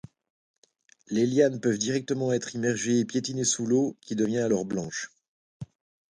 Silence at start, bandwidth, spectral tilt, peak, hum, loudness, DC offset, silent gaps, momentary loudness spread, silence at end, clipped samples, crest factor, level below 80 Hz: 1.1 s; 11 kHz; -4.5 dB/octave; -10 dBFS; none; -27 LUFS; under 0.1%; 5.28-5.60 s; 14 LU; 0.5 s; under 0.1%; 18 dB; -66 dBFS